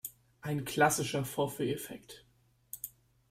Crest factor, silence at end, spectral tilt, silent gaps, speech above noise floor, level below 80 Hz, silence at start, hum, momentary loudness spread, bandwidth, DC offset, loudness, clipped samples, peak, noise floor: 22 dB; 0.4 s; -4 dB/octave; none; 22 dB; -66 dBFS; 0.05 s; none; 20 LU; 16 kHz; under 0.1%; -33 LUFS; under 0.1%; -14 dBFS; -54 dBFS